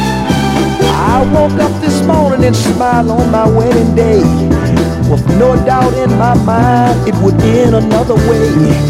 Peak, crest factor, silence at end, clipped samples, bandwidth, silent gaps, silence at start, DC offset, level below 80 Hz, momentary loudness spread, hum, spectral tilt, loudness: 0 dBFS; 8 dB; 0 s; 0.3%; 15.5 kHz; none; 0 s; under 0.1%; -24 dBFS; 3 LU; none; -7 dB/octave; -10 LUFS